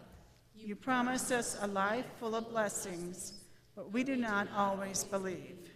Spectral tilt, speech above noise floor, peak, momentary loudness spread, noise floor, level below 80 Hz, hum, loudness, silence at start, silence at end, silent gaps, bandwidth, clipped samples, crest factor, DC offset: -3.5 dB/octave; 23 dB; -20 dBFS; 13 LU; -59 dBFS; -66 dBFS; none; -36 LUFS; 0 s; 0 s; none; 15.5 kHz; under 0.1%; 16 dB; under 0.1%